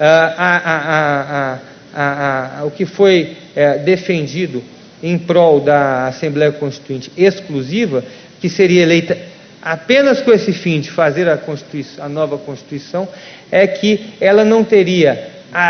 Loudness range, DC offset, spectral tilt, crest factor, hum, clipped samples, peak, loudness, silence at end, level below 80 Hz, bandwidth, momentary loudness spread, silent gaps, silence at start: 3 LU; under 0.1%; -6 dB/octave; 14 dB; none; under 0.1%; 0 dBFS; -14 LUFS; 0 s; -56 dBFS; 6.6 kHz; 14 LU; none; 0 s